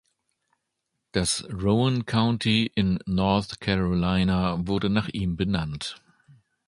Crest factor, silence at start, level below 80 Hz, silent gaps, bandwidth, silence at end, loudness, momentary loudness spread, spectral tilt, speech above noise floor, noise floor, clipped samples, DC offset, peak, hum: 20 dB; 1.15 s; -44 dBFS; none; 11.5 kHz; 0.75 s; -25 LUFS; 5 LU; -5.5 dB/octave; 56 dB; -80 dBFS; under 0.1%; under 0.1%; -6 dBFS; none